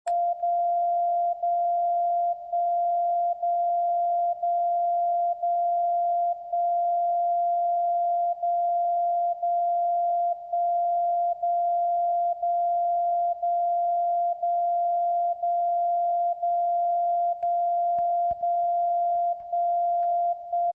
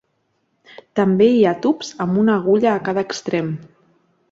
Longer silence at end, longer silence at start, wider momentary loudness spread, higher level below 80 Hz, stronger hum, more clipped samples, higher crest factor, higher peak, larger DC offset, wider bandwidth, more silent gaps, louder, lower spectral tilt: second, 0 s vs 0.65 s; second, 0.05 s vs 0.95 s; second, 1 LU vs 9 LU; second, -72 dBFS vs -62 dBFS; neither; neither; second, 6 dB vs 16 dB; second, -20 dBFS vs -4 dBFS; neither; second, 1.7 kHz vs 7.8 kHz; neither; second, -25 LUFS vs -18 LUFS; second, -5 dB/octave vs -6.5 dB/octave